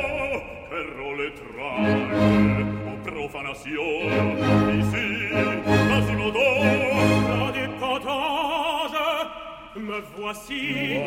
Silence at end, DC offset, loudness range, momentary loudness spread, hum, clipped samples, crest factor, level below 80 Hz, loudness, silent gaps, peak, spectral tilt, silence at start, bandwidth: 0 s; under 0.1%; 5 LU; 12 LU; none; under 0.1%; 16 dB; -46 dBFS; -24 LUFS; none; -6 dBFS; -6 dB/octave; 0 s; 16.5 kHz